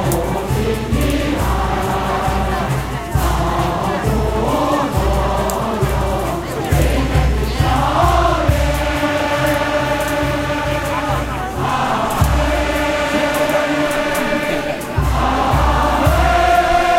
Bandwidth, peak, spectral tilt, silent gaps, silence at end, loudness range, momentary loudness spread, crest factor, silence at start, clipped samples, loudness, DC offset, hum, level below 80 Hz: 16.5 kHz; -2 dBFS; -5.5 dB/octave; none; 0 s; 2 LU; 5 LU; 14 dB; 0 s; under 0.1%; -17 LUFS; under 0.1%; none; -22 dBFS